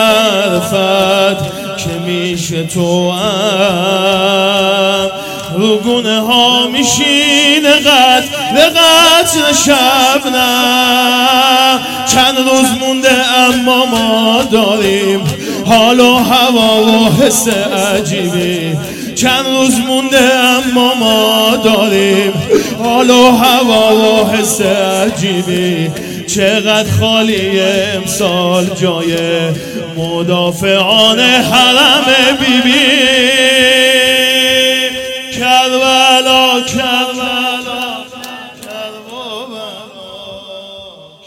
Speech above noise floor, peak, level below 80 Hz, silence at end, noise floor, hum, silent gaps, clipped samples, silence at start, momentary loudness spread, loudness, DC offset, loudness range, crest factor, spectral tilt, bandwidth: 24 dB; 0 dBFS; -44 dBFS; 0.2 s; -33 dBFS; none; none; 0.4%; 0 s; 12 LU; -9 LUFS; under 0.1%; 6 LU; 10 dB; -3 dB/octave; 17 kHz